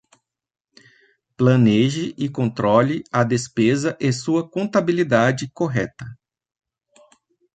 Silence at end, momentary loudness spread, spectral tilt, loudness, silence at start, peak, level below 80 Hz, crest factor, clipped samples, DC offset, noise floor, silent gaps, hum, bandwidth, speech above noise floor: 1.4 s; 9 LU; -6.5 dB/octave; -20 LUFS; 1.4 s; -2 dBFS; -56 dBFS; 20 dB; under 0.1%; under 0.1%; -62 dBFS; none; none; 9.2 kHz; 43 dB